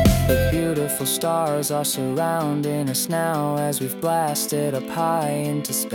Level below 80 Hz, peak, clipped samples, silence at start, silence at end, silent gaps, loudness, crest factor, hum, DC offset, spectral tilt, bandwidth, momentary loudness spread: -36 dBFS; -6 dBFS; under 0.1%; 0 s; 0 s; none; -22 LUFS; 16 dB; none; under 0.1%; -4.5 dB/octave; 18 kHz; 4 LU